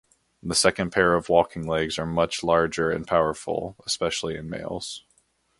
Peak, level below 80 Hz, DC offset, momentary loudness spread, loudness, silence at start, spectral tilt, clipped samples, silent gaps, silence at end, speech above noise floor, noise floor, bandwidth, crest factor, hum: -2 dBFS; -50 dBFS; under 0.1%; 12 LU; -24 LUFS; 0.45 s; -3.5 dB/octave; under 0.1%; none; 0.6 s; 42 dB; -66 dBFS; 11.5 kHz; 24 dB; none